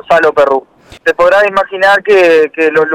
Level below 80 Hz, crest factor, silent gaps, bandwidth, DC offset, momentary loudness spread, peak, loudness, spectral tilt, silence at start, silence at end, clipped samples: -46 dBFS; 8 dB; none; 13.5 kHz; under 0.1%; 7 LU; -2 dBFS; -9 LUFS; -4 dB/octave; 0.1 s; 0 s; under 0.1%